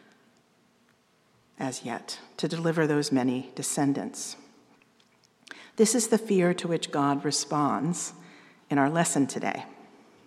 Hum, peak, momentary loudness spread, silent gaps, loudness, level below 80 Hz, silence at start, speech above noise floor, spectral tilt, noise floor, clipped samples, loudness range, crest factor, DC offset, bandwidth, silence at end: 60 Hz at -60 dBFS; -8 dBFS; 14 LU; none; -27 LUFS; -82 dBFS; 1.6 s; 38 dB; -4.5 dB/octave; -65 dBFS; under 0.1%; 4 LU; 20 dB; under 0.1%; 14.5 kHz; 0.45 s